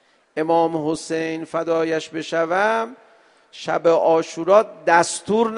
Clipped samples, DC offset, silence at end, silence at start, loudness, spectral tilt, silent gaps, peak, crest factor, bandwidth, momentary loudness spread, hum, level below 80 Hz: under 0.1%; under 0.1%; 0 s; 0.35 s; -20 LUFS; -4 dB/octave; none; 0 dBFS; 20 dB; 10.5 kHz; 9 LU; none; -66 dBFS